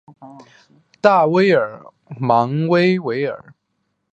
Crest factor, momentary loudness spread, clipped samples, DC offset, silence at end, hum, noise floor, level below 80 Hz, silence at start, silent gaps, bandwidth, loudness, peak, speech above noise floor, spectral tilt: 18 dB; 12 LU; under 0.1%; under 0.1%; 0.75 s; none; -71 dBFS; -64 dBFS; 0.2 s; none; 8.2 kHz; -17 LUFS; 0 dBFS; 54 dB; -7.5 dB/octave